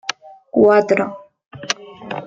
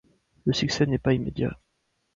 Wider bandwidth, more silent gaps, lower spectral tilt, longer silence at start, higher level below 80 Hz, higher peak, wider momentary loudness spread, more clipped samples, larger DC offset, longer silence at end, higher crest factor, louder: about the same, 7.8 kHz vs 7.6 kHz; first, 1.46-1.51 s vs none; second, -4 dB/octave vs -6 dB/octave; second, 0.05 s vs 0.45 s; second, -62 dBFS vs -48 dBFS; first, 0 dBFS vs -8 dBFS; first, 20 LU vs 7 LU; neither; neither; second, 0 s vs 0.6 s; about the same, 18 dB vs 18 dB; first, -17 LUFS vs -26 LUFS